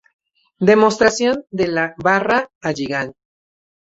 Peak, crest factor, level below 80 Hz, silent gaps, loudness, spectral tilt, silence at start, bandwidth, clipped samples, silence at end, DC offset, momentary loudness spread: -2 dBFS; 18 dB; -54 dBFS; 2.55-2.61 s; -17 LUFS; -4.5 dB/octave; 0.6 s; 8 kHz; under 0.1%; 0.75 s; under 0.1%; 11 LU